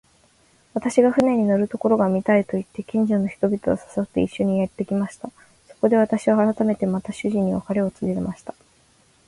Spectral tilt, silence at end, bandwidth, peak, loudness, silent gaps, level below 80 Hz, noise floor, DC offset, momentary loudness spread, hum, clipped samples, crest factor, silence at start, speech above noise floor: -7.5 dB/octave; 0.75 s; 11.5 kHz; -4 dBFS; -22 LUFS; none; -54 dBFS; -58 dBFS; under 0.1%; 9 LU; none; under 0.1%; 18 dB; 0.75 s; 37 dB